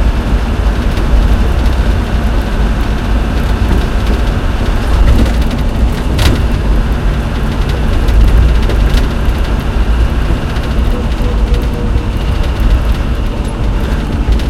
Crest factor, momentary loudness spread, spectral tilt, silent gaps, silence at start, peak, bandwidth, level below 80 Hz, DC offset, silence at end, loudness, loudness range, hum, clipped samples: 10 dB; 4 LU; -6.5 dB/octave; none; 0 s; 0 dBFS; 13 kHz; -12 dBFS; under 0.1%; 0 s; -14 LUFS; 2 LU; none; 0.2%